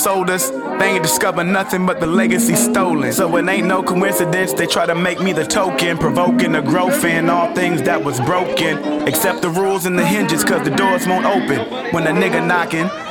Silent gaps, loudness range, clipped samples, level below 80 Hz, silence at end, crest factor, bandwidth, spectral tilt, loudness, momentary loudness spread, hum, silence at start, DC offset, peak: none; 1 LU; under 0.1%; -52 dBFS; 0 s; 14 dB; 19.5 kHz; -4 dB/octave; -16 LUFS; 3 LU; none; 0 s; 0.1%; -2 dBFS